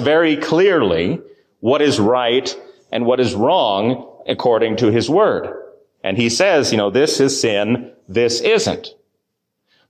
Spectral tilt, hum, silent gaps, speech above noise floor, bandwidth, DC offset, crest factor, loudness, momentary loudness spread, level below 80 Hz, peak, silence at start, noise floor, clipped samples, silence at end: -4.5 dB/octave; none; none; 58 dB; 14.5 kHz; under 0.1%; 12 dB; -16 LUFS; 12 LU; -50 dBFS; -4 dBFS; 0 s; -74 dBFS; under 0.1%; 1 s